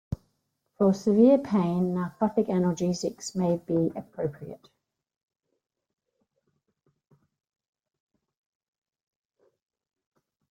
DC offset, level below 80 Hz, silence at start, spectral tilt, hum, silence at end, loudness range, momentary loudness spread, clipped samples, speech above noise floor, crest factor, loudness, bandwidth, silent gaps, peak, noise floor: under 0.1%; -60 dBFS; 0.1 s; -7.5 dB/octave; none; 5.95 s; 13 LU; 14 LU; under 0.1%; 52 dB; 20 dB; -26 LUFS; 9.8 kHz; none; -8 dBFS; -77 dBFS